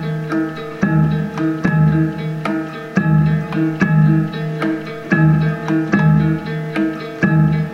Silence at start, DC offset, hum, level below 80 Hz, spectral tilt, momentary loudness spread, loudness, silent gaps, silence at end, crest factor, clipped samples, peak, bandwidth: 0 s; under 0.1%; none; -42 dBFS; -8.5 dB/octave; 8 LU; -17 LUFS; none; 0 s; 14 dB; under 0.1%; -2 dBFS; 6.6 kHz